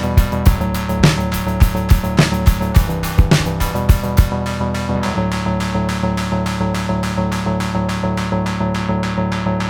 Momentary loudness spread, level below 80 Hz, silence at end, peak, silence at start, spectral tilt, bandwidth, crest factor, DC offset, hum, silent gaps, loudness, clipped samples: 5 LU; -20 dBFS; 0 s; 0 dBFS; 0 s; -6 dB/octave; over 20 kHz; 16 dB; under 0.1%; none; none; -17 LUFS; under 0.1%